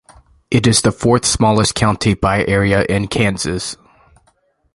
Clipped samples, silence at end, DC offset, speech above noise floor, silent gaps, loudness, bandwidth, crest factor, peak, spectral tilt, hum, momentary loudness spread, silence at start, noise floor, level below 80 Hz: under 0.1%; 1 s; under 0.1%; 45 dB; none; -15 LUFS; 11.5 kHz; 16 dB; 0 dBFS; -4.5 dB/octave; none; 8 LU; 0.5 s; -59 dBFS; -36 dBFS